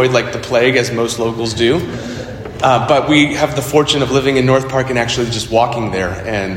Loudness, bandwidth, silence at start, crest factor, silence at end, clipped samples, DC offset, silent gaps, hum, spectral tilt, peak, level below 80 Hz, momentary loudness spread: -14 LUFS; 17 kHz; 0 s; 14 dB; 0 s; under 0.1%; under 0.1%; none; none; -5 dB/octave; 0 dBFS; -38 dBFS; 8 LU